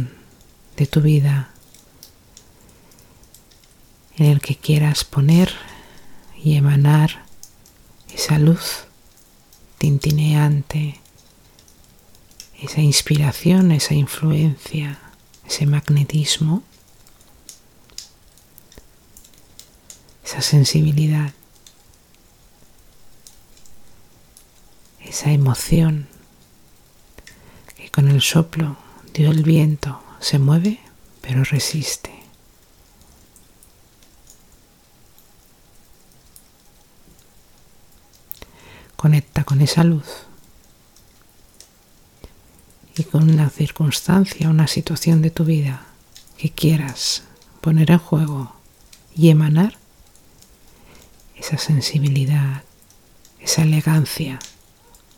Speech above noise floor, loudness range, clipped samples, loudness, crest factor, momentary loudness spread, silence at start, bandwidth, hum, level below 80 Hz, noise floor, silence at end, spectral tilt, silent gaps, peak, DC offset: 36 dB; 7 LU; under 0.1%; -18 LUFS; 20 dB; 19 LU; 0 s; 17 kHz; none; -46 dBFS; -52 dBFS; 0.7 s; -5.5 dB/octave; none; 0 dBFS; under 0.1%